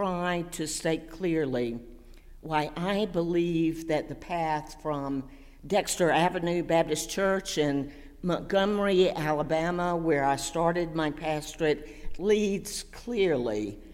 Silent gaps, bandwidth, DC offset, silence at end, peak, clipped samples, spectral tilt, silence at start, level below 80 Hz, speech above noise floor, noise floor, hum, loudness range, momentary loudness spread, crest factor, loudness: none; 16 kHz; under 0.1%; 0 s; -12 dBFS; under 0.1%; -5 dB/octave; 0 s; -48 dBFS; 20 dB; -48 dBFS; none; 3 LU; 9 LU; 16 dB; -28 LUFS